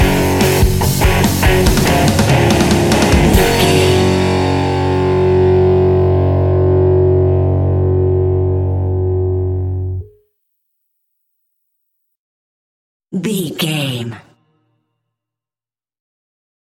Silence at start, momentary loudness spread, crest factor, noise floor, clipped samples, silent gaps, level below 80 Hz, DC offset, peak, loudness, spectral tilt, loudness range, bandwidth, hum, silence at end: 0 s; 8 LU; 14 dB; under -90 dBFS; under 0.1%; 12.17-13.00 s; -26 dBFS; under 0.1%; 0 dBFS; -13 LUFS; -6 dB/octave; 13 LU; 17 kHz; none; 2.5 s